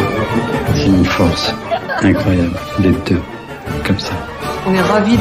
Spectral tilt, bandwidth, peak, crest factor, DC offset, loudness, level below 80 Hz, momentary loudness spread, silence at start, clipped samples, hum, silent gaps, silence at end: -6 dB/octave; 16 kHz; -2 dBFS; 14 dB; under 0.1%; -15 LUFS; -32 dBFS; 10 LU; 0 s; under 0.1%; none; none; 0 s